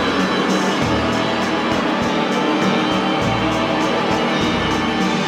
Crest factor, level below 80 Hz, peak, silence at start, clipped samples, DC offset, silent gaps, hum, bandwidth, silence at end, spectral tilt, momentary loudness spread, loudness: 12 dB; -40 dBFS; -6 dBFS; 0 s; under 0.1%; under 0.1%; none; none; 15 kHz; 0 s; -5 dB/octave; 1 LU; -18 LUFS